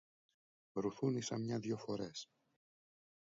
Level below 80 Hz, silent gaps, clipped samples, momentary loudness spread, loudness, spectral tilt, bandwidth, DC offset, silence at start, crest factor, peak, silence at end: -78 dBFS; none; under 0.1%; 10 LU; -42 LUFS; -6.5 dB/octave; 7.4 kHz; under 0.1%; 0.75 s; 20 dB; -24 dBFS; 1 s